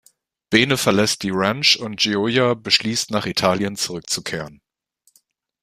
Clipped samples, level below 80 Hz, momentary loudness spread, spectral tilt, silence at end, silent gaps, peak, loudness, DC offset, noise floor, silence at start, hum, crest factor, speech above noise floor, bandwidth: under 0.1%; -56 dBFS; 8 LU; -3.5 dB/octave; 1.1 s; none; 0 dBFS; -19 LUFS; under 0.1%; -64 dBFS; 0.5 s; none; 22 dB; 44 dB; 15.5 kHz